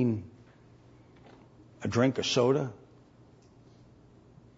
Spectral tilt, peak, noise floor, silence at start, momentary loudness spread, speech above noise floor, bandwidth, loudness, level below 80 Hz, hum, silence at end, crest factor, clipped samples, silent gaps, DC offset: -5.5 dB/octave; -12 dBFS; -58 dBFS; 0 s; 13 LU; 30 dB; 7.8 kHz; -29 LUFS; -66 dBFS; 60 Hz at -55 dBFS; 1.8 s; 20 dB; under 0.1%; none; under 0.1%